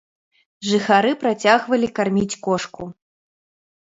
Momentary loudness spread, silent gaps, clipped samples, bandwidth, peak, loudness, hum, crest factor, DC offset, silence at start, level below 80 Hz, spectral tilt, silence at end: 15 LU; none; under 0.1%; 8 kHz; 0 dBFS; -19 LUFS; none; 20 dB; under 0.1%; 0.6 s; -56 dBFS; -4.5 dB/octave; 0.95 s